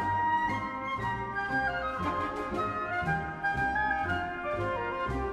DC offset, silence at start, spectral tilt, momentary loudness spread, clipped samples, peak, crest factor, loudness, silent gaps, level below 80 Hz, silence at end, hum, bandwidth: under 0.1%; 0 s; -6.5 dB/octave; 5 LU; under 0.1%; -18 dBFS; 14 dB; -31 LUFS; none; -48 dBFS; 0 s; none; 13 kHz